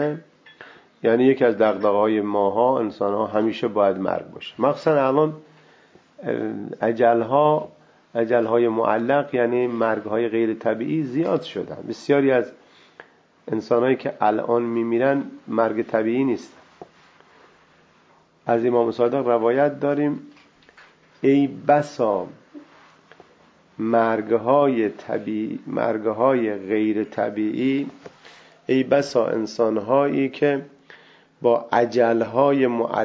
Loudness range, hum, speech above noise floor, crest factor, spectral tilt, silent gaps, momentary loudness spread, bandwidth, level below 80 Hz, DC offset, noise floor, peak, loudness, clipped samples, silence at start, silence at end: 3 LU; none; 36 dB; 18 dB; -7.5 dB/octave; none; 9 LU; 8 kHz; -68 dBFS; under 0.1%; -57 dBFS; -4 dBFS; -21 LUFS; under 0.1%; 0 s; 0 s